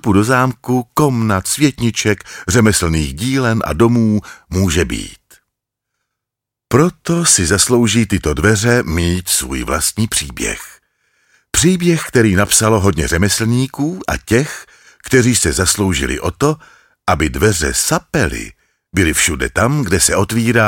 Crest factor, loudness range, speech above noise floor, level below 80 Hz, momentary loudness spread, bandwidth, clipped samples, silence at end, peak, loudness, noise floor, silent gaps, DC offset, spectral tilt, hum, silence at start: 14 dB; 3 LU; 68 dB; -32 dBFS; 9 LU; 17 kHz; under 0.1%; 0 s; 0 dBFS; -14 LUFS; -82 dBFS; none; under 0.1%; -4 dB/octave; none; 0.05 s